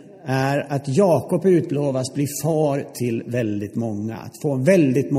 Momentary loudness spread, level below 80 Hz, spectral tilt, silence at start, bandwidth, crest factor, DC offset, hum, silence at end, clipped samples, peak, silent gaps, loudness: 9 LU; -62 dBFS; -6.5 dB/octave; 0 s; 15.5 kHz; 18 dB; under 0.1%; none; 0 s; under 0.1%; -2 dBFS; none; -21 LUFS